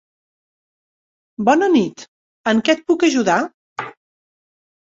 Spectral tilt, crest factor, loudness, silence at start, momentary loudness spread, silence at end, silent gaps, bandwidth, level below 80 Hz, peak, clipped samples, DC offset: -4.5 dB/octave; 18 dB; -17 LUFS; 1.4 s; 16 LU; 1.05 s; 2.08-2.44 s, 3.54-3.76 s; 7.8 kHz; -64 dBFS; -2 dBFS; under 0.1%; under 0.1%